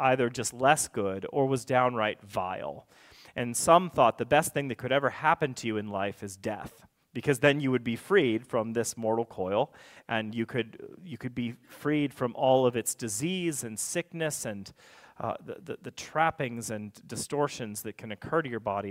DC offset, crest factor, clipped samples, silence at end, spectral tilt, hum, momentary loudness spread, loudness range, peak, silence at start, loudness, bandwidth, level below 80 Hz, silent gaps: under 0.1%; 24 dB; under 0.1%; 0 s; -4.5 dB/octave; none; 15 LU; 7 LU; -6 dBFS; 0 s; -29 LUFS; 16 kHz; -64 dBFS; none